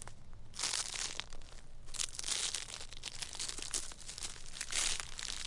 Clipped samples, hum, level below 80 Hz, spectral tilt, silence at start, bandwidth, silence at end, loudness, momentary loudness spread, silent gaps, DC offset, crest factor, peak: under 0.1%; none; -50 dBFS; 0.5 dB/octave; 0 s; 11.5 kHz; 0 s; -38 LUFS; 18 LU; none; under 0.1%; 28 dB; -14 dBFS